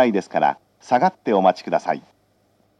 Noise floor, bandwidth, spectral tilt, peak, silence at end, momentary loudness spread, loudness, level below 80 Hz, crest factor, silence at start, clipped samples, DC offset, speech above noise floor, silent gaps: -62 dBFS; 9.4 kHz; -6 dB/octave; -2 dBFS; 0.8 s; 9 LU; -20 LUFS; -74 dBFS; 18 dB; 0 s; under 0.1%; under 0.1%; 42 dB; none